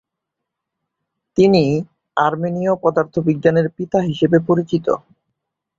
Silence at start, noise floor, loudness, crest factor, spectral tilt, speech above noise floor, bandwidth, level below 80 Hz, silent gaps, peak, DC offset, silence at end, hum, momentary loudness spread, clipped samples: 1.35 s; -81 dBFS; -17 LUFS; 18 dB; -8 dB/octave; 64 dB; 7.6 kHz; -54 dBFS; none; -2 dBFS; under 0.1%; 0.8 s; none; 9 LU; under 0.1%